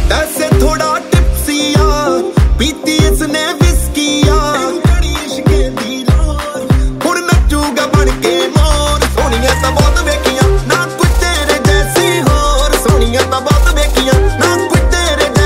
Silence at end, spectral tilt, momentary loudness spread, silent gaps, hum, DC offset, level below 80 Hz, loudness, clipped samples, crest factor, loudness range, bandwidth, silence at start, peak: 0 s; -4.5 dB/octave; 3 LU; none; none; under 0.1%; -14 dBFS; -12 LUFS; under 0.1%; 10 dB; 2 LU; 16.5 kHz; 0 s; 0 dBFS